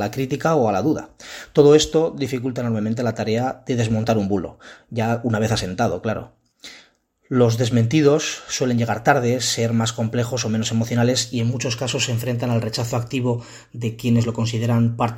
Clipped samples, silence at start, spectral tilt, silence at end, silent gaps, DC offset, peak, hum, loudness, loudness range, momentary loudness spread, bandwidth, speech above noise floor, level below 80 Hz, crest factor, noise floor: under 0.1%; 0 s; -5.5 dB/octave; 0 s; none; under 0.1%; 0 dBFS; none; -20 LUFS; 4 LU; 9 LU; 16.5 kHz; 36 dB; -50 dBFS; 20 dB; -56 dBFS